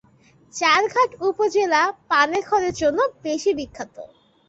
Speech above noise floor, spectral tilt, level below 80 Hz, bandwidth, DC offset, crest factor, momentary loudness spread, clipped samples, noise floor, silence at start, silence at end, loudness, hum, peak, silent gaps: 34 dB; -2.5 dB/octave; -56 dBFS; 8 kHz; under 0.1%; 18 dB; 13 LU; under 0.1%; -55 dBFS; 0.55 s; 0.45 s; -20 LUFS; none; -4 dBFS; none